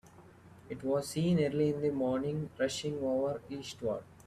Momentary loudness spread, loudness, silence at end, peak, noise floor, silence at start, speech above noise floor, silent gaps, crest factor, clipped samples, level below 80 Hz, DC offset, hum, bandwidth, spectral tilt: 10 LU; -34 LUFS; 0.05 s; -18 dBFS; -56 dBFS; 0.05 s; 23 dB; none; 16 dB; under 0.1%; -66 dBFS; under 0.1%; none; 14 kHz; -6 dB/octave